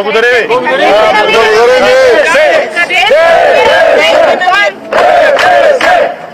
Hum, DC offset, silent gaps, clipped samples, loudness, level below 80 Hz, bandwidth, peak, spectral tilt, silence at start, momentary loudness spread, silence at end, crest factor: none; 0.3%; none; 1%; -6 LUFS; -42 dBFS; 15.5 kHz; 0 dBFS; -2.5 dB/octave; 0 s; 4 LU; 0 s; 6 dB